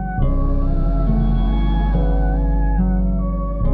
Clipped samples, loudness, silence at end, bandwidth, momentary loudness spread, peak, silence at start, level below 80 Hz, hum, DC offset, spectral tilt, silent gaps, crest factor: under 0.1%; -20 LUFS; 0 s; 3.5 kHz; 2 LU; -6 dBFS; 0 s; -18 dBFS; none; under 0.1%; -11 dB/octave; none; 10 dB